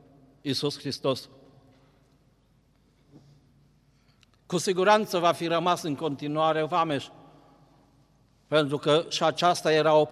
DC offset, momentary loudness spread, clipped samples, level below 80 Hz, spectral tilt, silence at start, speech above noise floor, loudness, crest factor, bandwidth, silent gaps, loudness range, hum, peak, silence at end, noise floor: under 0.1%; 9 LU; under 0.1%; -70 dBFS; -4.5 dB/octave; 0.45 s; 39 dB; -26 LUFS; 20 dB; 15 kHz; none; 11 LU; none; -8 dBFS; 0 s; -64 dBFS